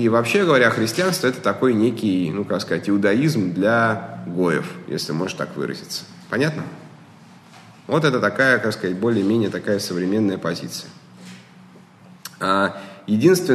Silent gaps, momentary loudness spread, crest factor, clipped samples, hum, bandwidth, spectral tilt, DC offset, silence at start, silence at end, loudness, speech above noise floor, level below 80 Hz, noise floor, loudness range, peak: none; 14 LU; 18 dB; under 0.1%; none; 13 kHz; -5.5 dB/octave; under 0.1%; 0 s; 0 s; -20 LUFS; 27 dB; -66 dBFS; -46 dBFS; 6 LU; -2 dBFS